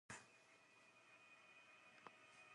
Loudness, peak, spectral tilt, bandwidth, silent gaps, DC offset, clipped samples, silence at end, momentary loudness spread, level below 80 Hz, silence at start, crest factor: -65 LUFS; -40 dBFS; -2 dB/octave; 11 kHz; none; under 0.1%; under 0.1%; 0 s; 9 LU; under -90 dBFS; 0.1 s; 26 dB